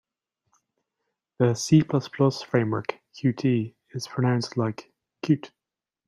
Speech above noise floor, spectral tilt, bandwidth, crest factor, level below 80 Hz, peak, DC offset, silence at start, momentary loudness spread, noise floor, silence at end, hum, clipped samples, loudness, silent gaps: 64 dB; -6.5 dB/octave; 12.5 kHz; 20 dB; -64 dBFS; -6 dBFS; under 0.1%; 1.4 s; 14 LU; -88 dBFS; 0.6 s; none; under 0.1%; -25 LUFS; none